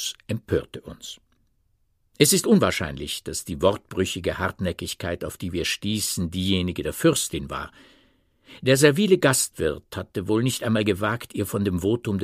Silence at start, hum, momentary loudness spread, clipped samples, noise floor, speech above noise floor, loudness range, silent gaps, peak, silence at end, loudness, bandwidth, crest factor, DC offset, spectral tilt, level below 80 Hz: 0 s; none; 14 LU; under 0.1%; -67 dBFS; 43 dB; 4 LU; none; -2 dBFS; 0 s; -23 LUFS; 15.5 kHz; 22 dB; under 0.1%; -4 dB/octave; -48 dBFS